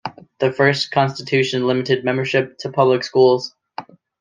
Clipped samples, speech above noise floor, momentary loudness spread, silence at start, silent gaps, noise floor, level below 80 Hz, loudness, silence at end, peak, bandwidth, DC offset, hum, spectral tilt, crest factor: under 0.1%; 19 dB; 17 LU; 0.05 s; none; -36 dBFS; -62 dBFS; -18 LUFS; 0.4 s; -2 dBFS; 9.2 kHz; under 0.1%; none; -5.5 dB/octave; 16 dB